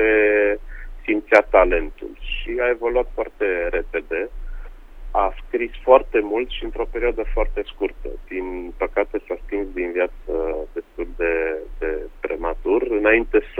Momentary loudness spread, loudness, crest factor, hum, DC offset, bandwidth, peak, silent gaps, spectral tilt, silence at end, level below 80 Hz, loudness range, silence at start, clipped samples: 15 LU; -22 LUFS; 22 dB; none; under 0.1%; 6.8 kHz; 0 dBFS; none; -6.5 dB/octave; 0 s; -32 dBFS; 6 LU; 0 s; under 0.1%